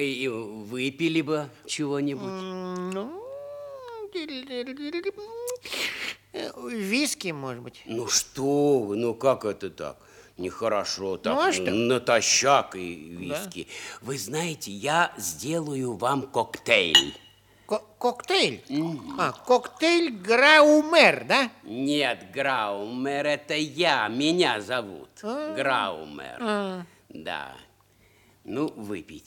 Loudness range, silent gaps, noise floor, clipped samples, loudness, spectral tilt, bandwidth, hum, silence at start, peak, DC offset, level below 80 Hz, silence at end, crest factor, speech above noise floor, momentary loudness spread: 13 LU; none; -60 dBFS; under 0.1%; -25 LUFS; -3 dB/octave; 18.5 kHz; none; 0 s; -2 dBFS; under 0.1%; -68 dBFS; 0.05 s; 24 dB; 34 dB; 17 LU